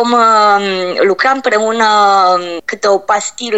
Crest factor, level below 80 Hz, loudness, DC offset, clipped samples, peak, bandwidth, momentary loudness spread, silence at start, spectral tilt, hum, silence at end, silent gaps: 10 dB; -60 dBFS; -11 LUFS; 0.4%; under 0.1%; 0 dBFS; 8.6 kHz; 7 LU; 0 s; -2.5 dB/octave; none; 0 s; none